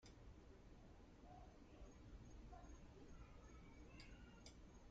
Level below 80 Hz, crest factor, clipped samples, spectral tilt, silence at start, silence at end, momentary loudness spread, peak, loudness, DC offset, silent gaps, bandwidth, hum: -64 dBFS; 14 dB; under 0.1%; -5.5 dB/octave; 0 s; 0 s; 4 LU; -48 dBFS; -64 LUFS; under 0.1%; none; 7.6 kHz; none